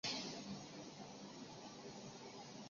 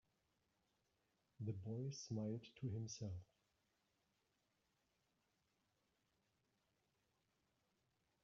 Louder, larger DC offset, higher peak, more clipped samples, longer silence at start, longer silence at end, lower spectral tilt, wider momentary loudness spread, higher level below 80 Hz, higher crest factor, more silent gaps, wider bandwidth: about the same, -51 LUFS vs -50 LUFS; neither; first, -30 dBFS vs -36 dBFS; neither; second, 0.05 s vs 1.4 s; second, 0 s vs 5 s; second, -2.5 dB/octave vs -8 dB/octave; first, 8 LU vs 5 LU; about the same, -82 dBFS vs -84 dBFS; about the same, 22 dB vs 18 dB; neither; about the same, 7.4 kHz vs 7.2 kHz